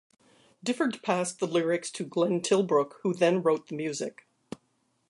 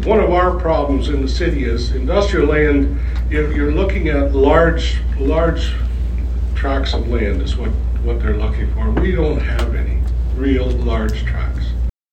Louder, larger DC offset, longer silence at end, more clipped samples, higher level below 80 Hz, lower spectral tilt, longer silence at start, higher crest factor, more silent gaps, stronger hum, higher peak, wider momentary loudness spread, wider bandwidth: second, -28 LUFS vs -18 LUFS; neither; first, 1 s vs 0.25 s; neither; second, -78 dBFS vs -18 dBFS; second, -5 dB/octave vs -7.5 dB/octave; first, 0.65 s vs 0 s; about the same, 18 dB vs 16 dB; neither; neither; second, -10 dBFS vs 0 dBFS; first, 14 LU vs 7 LU; first, 11.5 kHz vs 8.2 kHz